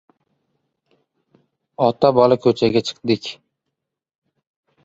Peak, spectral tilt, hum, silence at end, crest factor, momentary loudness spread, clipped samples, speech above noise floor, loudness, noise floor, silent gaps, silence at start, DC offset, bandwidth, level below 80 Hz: -2 dBFS; -6.5 dB/octave; none; 1.5 s; 20 dB; 8 LU; under 0.1%; 63 dB; -17 LUFS; -80 dBFS; none; 1.8 s; under 0.1%; 7.8 kHz; -58 dBFS